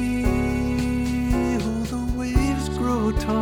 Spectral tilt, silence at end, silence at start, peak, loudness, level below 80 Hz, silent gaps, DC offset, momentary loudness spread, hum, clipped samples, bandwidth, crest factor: -6.5 dB/octave; 0 s; 0 s; -8 dBFS; -24 LUFS; -30 dBFS; none; under 0.1%; 3 LU; none; under 0.1%; 18 kHz; 16 dB